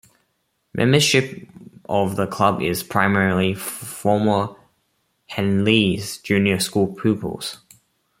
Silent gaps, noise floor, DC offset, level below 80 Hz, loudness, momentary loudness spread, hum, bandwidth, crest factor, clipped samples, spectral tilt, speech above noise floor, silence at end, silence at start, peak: none; -70 dBFS; under 0.1%; -56 dBFS; -20 LUFS; 14 LU; none; 16.5 kHz; 20 dB; under 0.1%; -5 dB/octave; 51 dB; 0.65 s; 0.75 s; -2 dBFS